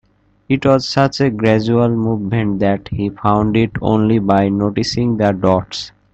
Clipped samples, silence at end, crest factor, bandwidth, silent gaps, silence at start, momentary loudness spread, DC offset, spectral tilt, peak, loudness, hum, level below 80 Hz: under 0.1%; 0.25 s; 16 dB; 8.2 kHz; none; 0.5 s; 5 LU; under 0.1%; -7 dB/octave; 0 dBFS; -15 LUFS; none; -42 dBFS